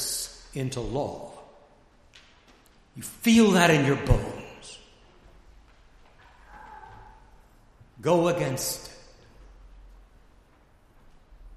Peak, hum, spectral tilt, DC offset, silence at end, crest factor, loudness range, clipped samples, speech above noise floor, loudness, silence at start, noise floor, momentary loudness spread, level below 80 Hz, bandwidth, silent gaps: -4 dBFS; none; -5 dB/octave; under 0.1%; 0.1 s; 26 dB; 11 LU; under 0.1%; 35 dB; -24 LUFS; 0 s; -58 dBFS; 27 LU; -42 dBFS; 15 kHz; none